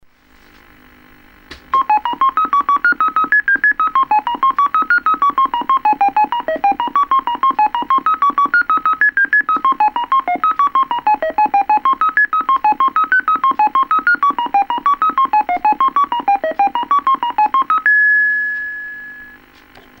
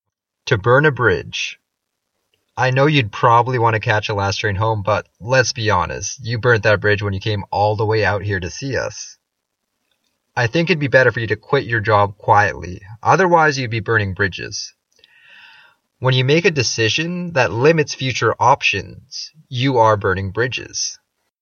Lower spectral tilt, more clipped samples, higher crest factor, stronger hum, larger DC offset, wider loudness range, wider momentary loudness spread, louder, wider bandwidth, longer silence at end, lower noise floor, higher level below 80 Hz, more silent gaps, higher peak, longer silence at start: about the same, -4 dB/octave vs -4.5 dB/octave; neither; second, 12 dB vs 18 dB; neither; neither; second, 1 LU vs 4 LU; second, 4 LU vs 11 LU; first, -14 LUFS vs -17 LUFS; first, 16.5 kHz vs 7.2 kHz; first, 0.7 s vs 0.45 s; second, -48 dBFS vs -76 dBFS; about the same, -52 dBFS vs -50 dBFS; neither; about the same, -2 dBFS vs 0 dBFS; first, 1.5 s vs 0.45 s